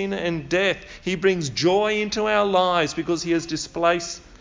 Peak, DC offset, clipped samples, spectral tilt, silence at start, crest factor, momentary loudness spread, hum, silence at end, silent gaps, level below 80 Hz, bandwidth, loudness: -6 dBFS; under 0.1%; under 0.1%; -4.5 dB/octave; 0 s; 16 dB; 7 LU; none; 0.05 s; none; -50 dBFS; 7.6 kHz; -22 LUFS